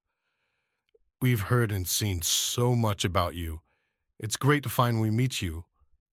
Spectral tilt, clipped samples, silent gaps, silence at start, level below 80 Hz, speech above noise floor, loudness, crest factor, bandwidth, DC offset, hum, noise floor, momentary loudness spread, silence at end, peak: -4.5 dB/octave; under 0.1%; none; 1.2 s; -50 dBFS; 52 dB; -27 LUFS; 20 dB; 16.5 kHz; under 0.1%; none; -79 dBFS; 12 LU; 0.5 s; -8 dBFS